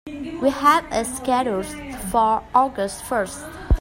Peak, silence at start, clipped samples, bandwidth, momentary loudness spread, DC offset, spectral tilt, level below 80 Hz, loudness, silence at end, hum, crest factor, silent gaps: -2 dBFS; 0.05 s; under 0.1%; 16 kHz; 13 LU; under 0.1%; -4.5 dB/octave; -32 dBFS; -21 LUFS; 0 s; none; 18 dB; none